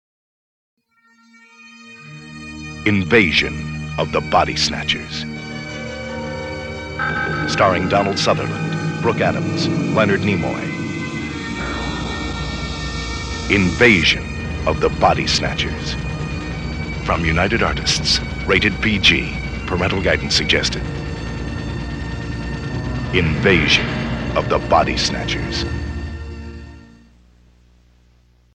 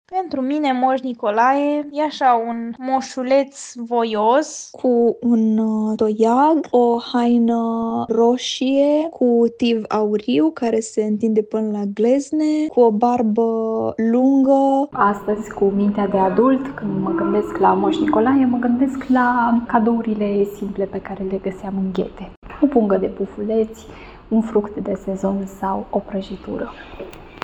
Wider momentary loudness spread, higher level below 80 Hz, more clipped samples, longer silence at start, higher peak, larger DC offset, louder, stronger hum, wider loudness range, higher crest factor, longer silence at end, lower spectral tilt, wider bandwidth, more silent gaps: first, 14 LU vs 10 LU; first, -32 dBFS vs -50 dBFS; neither; first, 1.6 s vs 0.1 s; about the same, 0 dBFS vs -2 dBFS; neither; about the same, -18 LUFS vs -19 LUFS; first, 60 Hz at -35 dBFS vs none; about the same, 5 LU vs 5 LU; about the same, 20 dB vs 16 dB; first, 1.65 s vs 0.05 s; second, -4.5 dB/octave vs -6 dB/octave; first, 11 kHz vs 9.4 kHz; second, none vs 22.37-22.42 s